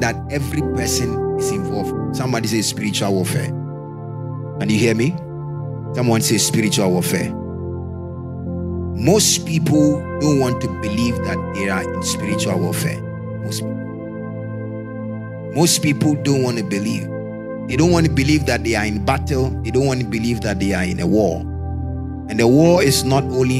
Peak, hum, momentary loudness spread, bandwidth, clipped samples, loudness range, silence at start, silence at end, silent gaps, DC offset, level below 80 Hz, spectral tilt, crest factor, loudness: 0 dBFS; none; 13 LU; 16 kHz; under 0.1%; 4 LU; 0 s; 0 s; none; under 0.1%; -36 dBFS; -5 dB/octave; 18 dB; -19 LUFS